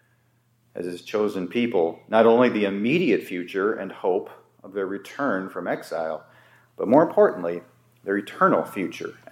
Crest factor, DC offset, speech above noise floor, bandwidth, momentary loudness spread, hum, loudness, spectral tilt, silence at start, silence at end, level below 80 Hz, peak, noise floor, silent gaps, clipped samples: 22 dB; under 0.1%; 42 dB; 16 kHz; 15 LU; none; -23 LUFS; -6.5 dB/octave; 0.75 s; 0.2 s; -78 dBFS; -2 dBFS; -64 dBFS; none; under 0.1%